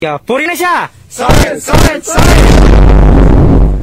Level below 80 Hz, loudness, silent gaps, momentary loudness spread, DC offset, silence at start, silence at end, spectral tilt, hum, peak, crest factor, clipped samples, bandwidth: -8 dBFS; -8 LUFS; none; 8 LU; under 0.1%; 0 s; 0 s; -5.5 dB/octave; none; 0 dBFS; 6 dB; 0.7%; 16 kHz